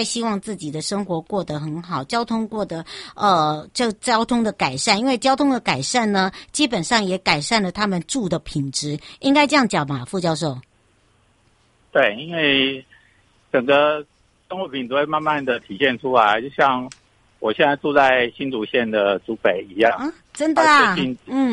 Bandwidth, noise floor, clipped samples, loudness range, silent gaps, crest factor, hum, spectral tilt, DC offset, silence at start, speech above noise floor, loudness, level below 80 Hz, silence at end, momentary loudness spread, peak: 11.5 kHz; -59 dBFS; under 0.1%; 3 LU; none; 18 dB; none; -4 dB/octave; under 0.1%; 0 s; 39 dB; -20 LUFS; -54 dBFS; 0 s; 11 LU; -2 dBFS